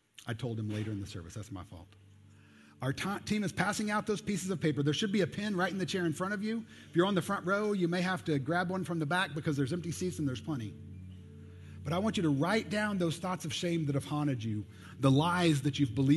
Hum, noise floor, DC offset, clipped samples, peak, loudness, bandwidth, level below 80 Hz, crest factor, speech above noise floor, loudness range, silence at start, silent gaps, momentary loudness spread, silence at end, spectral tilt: none; -58 dBFS; under 0.1%; under 0.1%; -12 dBFS; -33 LUFS; 12.5 kHz; -60 dBFS; 20 dB; 26 dB; 4 LU; 0.2 s; none; 15 LU; 0 s; -5.5 dB/octave